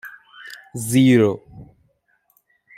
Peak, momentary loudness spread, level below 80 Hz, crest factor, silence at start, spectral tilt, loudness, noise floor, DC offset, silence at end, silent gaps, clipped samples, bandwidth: -4 dBFS; 25 LU; -60 dBFS; 18 dB; 0.05 s; -6 dB/octave; -17 LUFS; -65 dBFS; under 0.1%; 1.15 s; none; under 0.1%; 16 kHz